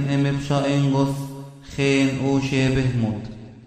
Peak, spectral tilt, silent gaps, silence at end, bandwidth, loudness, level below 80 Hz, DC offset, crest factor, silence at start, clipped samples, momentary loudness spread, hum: -6 dBFS; -6.5 dB/octave; none; 0 s; 11.5 kHz; -21 LUFS; -44 dBFS; under 0.1%; 16 dB; 0 s; under 0.1%; 14 LU; none